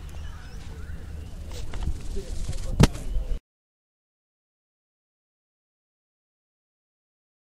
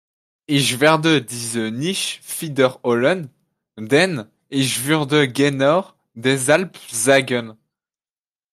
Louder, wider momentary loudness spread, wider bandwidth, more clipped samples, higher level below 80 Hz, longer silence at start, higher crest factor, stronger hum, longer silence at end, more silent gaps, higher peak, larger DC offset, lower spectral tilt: second, -30 LUFS vs -18 LUFS; first, 18 LU vs 10 LU; second, 13.5 kHz vs 15.5 kHz; neither; first, -34 dBFS vs -62 dBFS; second, 0 s vs 0.5 s; first, 26 dB vs 18 dB; neither; first, 4.05 s vs 1 s; neither; about the same, -4 dBFS vs -2 dBFS; neither; first, -5.5 dB/octave vs -4 dB/octave